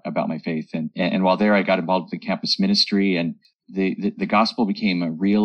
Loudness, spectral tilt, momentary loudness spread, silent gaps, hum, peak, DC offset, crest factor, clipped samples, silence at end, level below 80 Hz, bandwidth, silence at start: -21 LUFS; -6 dB/octave; 9 LU; 3.55-3.59 s; none; -6 dBFS; under 0.1%; 16 dB; under 0.1%; 0 s; -64 dBFS; 8.8 kHz; 0.05 s